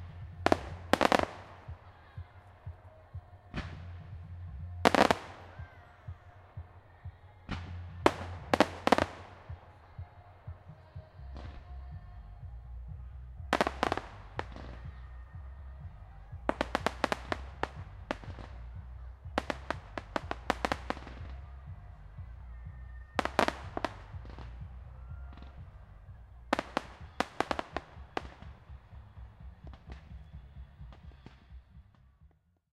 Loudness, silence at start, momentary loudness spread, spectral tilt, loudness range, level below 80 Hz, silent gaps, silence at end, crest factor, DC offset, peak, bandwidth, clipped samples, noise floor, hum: -34 LUFS; 0 s; 22 LU; -5 dB/octave; 15 LU; -50 dBFS; none; 0.45 s; 34 dB; under 0.1%; -2 dBFS; 15.5 kHz; under 0.1%; -64 dBFS; none